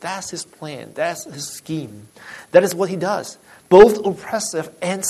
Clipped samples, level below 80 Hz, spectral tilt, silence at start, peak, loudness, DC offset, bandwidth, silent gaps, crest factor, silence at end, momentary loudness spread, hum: under 0.1%; -52 dBFS; -4.5 dB/octave; 0 s; 0 dBFS; -18 LUFS; under 0.1%; 13.5 kHz; none; 18 dB; 0 s; 22 LU; none